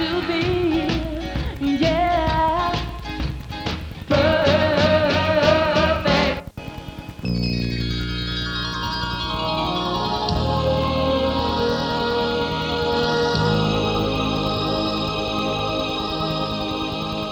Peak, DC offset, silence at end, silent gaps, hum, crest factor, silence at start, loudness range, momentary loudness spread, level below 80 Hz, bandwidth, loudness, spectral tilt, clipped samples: -2 dBFS; under 0.1%; 0 s; none; none; 18 dB; 0 s; 5 LU; 10 LU; -34 dBFS; 18 kHz; -21 LUFS; -6 dB/octave; under 0.1%